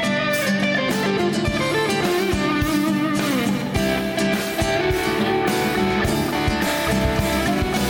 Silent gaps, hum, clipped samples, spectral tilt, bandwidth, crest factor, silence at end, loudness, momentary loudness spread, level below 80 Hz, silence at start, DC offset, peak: none; none; under 0.1%; -5 dB/octave; 19.5 kHz; 14 dB; 0 s; -20 LUFS; 1 LU; -36 dBFS; 0 s; under 0.1%; -8 dBFS